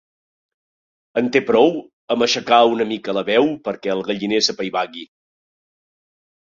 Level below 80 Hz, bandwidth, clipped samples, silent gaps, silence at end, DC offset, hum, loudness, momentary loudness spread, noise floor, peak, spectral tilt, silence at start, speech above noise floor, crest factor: -64 dBFS; 7.6 kHz; under 0.1%; 1.93-2.08 s; 1.45 s; under 0.1%; none; -18 LUFS; 11 LU; under -90 dBFS; -2 dBFS; -3.5 dB/octave; 1.15 s; over 72 dB; 18 dB